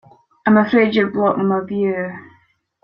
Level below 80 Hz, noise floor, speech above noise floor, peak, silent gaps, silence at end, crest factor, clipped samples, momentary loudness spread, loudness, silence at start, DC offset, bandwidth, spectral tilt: -60 dBFS; -58 dBFS; 42 dB; -2 dBFS; none; 0.6 s; 16 dB; under 0.1%; 12 LU; -17 LUFS; 0.45 s; under 0.1%; 5.6 kHz; -9 dB/octave